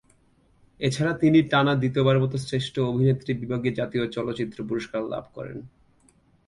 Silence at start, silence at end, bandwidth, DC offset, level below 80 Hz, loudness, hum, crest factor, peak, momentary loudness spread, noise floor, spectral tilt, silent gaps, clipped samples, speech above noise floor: 0.8 s; 0.8 s; 11.5 kHz; under 0.1%; -56 dBFS; -24 LUFS; none; 16 dB; -8 dBFS; 13 LU; -61 dBFS; -7 dB/octave; none; under 0.1%; 38 dB